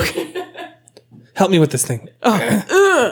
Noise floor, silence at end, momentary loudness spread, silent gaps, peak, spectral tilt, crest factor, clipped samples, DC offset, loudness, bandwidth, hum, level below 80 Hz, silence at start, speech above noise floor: -46 dBFS; 0 s; 20 LU; none; -2 dBFS; -4.5 dB/octave; 14 dB; under 0.1%; under 0.1%; -16 LUFS; over 20 kHz; none; -48 dBFS; 0 s; 31 dB